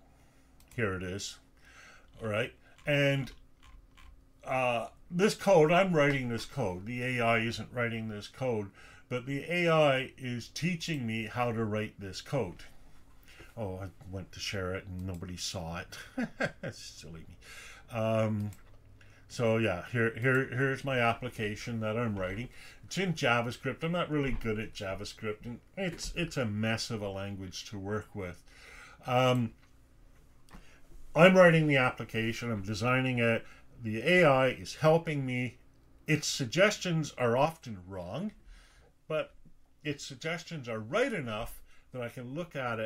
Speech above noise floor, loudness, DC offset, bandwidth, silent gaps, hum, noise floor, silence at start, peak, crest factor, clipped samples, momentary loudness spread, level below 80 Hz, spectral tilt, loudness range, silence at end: 30 dB; -31 LUFS; under 0.1%; 16 kHz; none; none; -61 dBFS; 0.7 s; -6 dBFS; 26 dB; under 0.1%; 17 LU; -54 dBFS; -5.5 dB/octave; 11 LU; 0 s